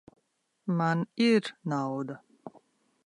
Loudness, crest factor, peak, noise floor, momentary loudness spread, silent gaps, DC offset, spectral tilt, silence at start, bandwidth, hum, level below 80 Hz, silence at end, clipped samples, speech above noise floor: -29 LUFS; 16 dB; -14 dBFS; -76 dBFS; 24 LU; none; under 0.1%; -6.5 dB/octave; 0.65 s; 10.5 kHz; none; -80 dBFS; 0.55 s; under 0.1%; 48 dB